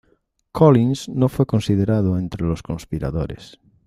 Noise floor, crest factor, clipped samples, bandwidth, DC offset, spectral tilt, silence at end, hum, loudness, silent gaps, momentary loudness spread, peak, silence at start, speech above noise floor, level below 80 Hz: -63 dBFS; 18 dB; under 0.1%; 14.5 kHz; under 0.1%; -8 dB/octave; 0.4 s; none; -20 LUFS; none; 14 LU; -2 dBFS; 0.55 s; 45 dB; -42 dBFS